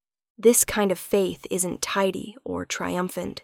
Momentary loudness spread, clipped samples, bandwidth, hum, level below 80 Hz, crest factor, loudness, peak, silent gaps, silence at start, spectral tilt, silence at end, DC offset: 12 LU; under 0.1%; 18 kHz; none; -54 dBFS; 20 dB; -24 LUFS; -4 dBFS; none; 0.4 s; -3.5 dB/octave; 0.05 s; under 0.1%